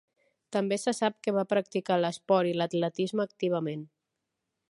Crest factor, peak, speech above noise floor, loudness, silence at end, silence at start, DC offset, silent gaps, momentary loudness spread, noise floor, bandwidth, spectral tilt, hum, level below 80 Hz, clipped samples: 18 dB; -12 dBFS; 56 dB; -29 LUFS; 0.85 s; 0.5 s; under 0.1%; none; 5 LU; -84 dBFS; 11.5 kHz; -5.5 dB/octave; none; -80 dBFS; under 0.1%